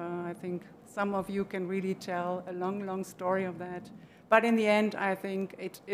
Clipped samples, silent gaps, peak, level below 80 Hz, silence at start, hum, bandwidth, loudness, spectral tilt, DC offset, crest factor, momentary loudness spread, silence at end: under 0.1%; none; -8 dBFS; -70 dBFS; 0 s; none; 15.5 kHz; -31 LUFS; -6 dB/octave; under 0.1%; 24 dB; 16 LU; 0 s